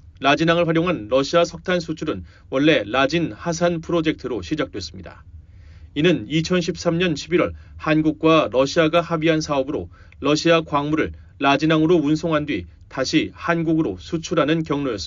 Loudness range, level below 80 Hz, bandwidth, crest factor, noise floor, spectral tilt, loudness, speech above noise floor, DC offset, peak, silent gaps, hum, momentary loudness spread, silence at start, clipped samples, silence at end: 4 LU; -46 dBFS; 7.6 kHz; 16 dB; -43 dBFS; -4.5 dB/octave; -20 LUFS; 23 dB; under 0.1%; -4 dBFS; none; none; 11 LU; 0.05 s; under 0.1%; 0 s